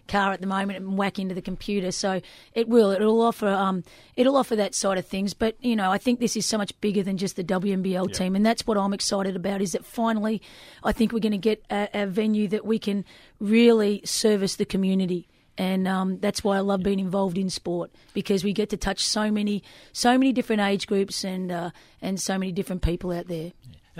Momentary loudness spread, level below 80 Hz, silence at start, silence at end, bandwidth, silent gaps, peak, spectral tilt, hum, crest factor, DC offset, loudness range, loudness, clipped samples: 10 LU; -46 dBFS; 0.1 s; 0 s; 15.5 kHz; none; -6 dBFS; -5 dB/octave; none; 18 dB; under 0.1%; 3 LU; -25 LUFS; under 0.1%